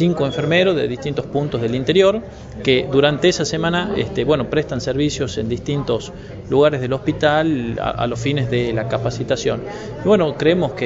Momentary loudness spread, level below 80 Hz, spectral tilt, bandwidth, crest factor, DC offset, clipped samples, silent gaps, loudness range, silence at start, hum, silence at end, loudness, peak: 8 LU; -42 dBFS; -5.5 dB/octave; 8 kHz; 16 dB; under 0.1%; under 0.1%; none; 2 LU; 0 s; none; 0 s; -19 LUFS; -2 dBFS